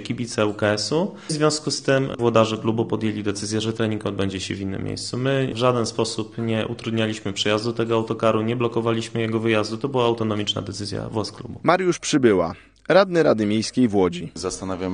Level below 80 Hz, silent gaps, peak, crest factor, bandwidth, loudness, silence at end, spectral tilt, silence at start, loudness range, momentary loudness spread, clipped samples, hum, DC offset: -54 dBFS; none; -2 dBFS; 20 dB; 10 kHz; -22 LUFS; 0 s; -5 dB/octave; 0 s; 4 LU; 9 LU; under 0.1%; none; 0.1%